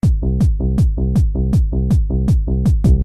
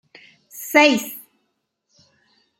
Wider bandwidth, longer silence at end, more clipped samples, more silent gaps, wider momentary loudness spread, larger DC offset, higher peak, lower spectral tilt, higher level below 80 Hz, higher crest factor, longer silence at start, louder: second, 10.5 kHz vs 17 kHz; second, 0 s vs 1.4 s; neither; neither; second, 1 LU vs 24 LU; first, 0.8% vs under 0.1%; about the same, -2 dBFS vs 0 dBFS; first, -9.5 dB/octave vs -2.5 dB/octave; first, -16 dBFS vs -72 dBFS; second, 12 dB vs 22 dB; second, 0.05 s vs 0.55 s; about the same, -17 LUFS vs -16 LUFS